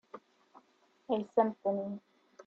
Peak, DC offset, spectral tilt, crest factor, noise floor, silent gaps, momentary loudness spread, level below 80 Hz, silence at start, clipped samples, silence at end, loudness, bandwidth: -14 dBFS; under 0.1%; -8 dB/octave; 22 dB; -69 dBFS; none; 22 LU; -80 dBFS; 0.15 s; under 0.1%; 0.05 s; -34 LUFS; 7.2 kHz